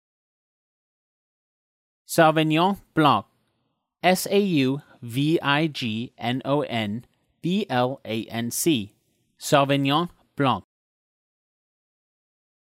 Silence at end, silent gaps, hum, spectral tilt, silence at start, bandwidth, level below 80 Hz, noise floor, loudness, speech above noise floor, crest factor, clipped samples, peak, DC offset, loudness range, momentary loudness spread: 2.05 s; none; none; -5 dB/octave; 2.1 s; 16 kHz; -68 dBFS; -75 dBFS; -23 LUFS; 52 dB; 20 dB; under 0.1%; -6 dBFS; under 0.1%; 4 LU; 11 LU